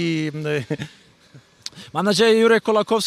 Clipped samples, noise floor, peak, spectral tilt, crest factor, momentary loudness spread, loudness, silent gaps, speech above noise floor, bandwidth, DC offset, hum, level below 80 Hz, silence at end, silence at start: under 0.1%; -50 dBFS; -4 dBFS; -4.5 dB/octave; 16 dB; 21 LU; -19 LUFS; none; 31 dB; 14 kHz; under 0.1%; none; -66 dBFS; 0 s; 0 s